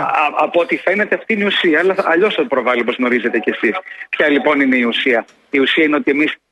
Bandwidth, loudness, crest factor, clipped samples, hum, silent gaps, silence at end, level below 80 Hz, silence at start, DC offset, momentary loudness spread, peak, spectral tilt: 11 kHz; -15 LUFS; 14 dB; under 0.1%; none; none; 0.15 s; -64 dBFS; 0 s; under 0.1%; 5 LU; -2 dBFS; -5.5 dB/octave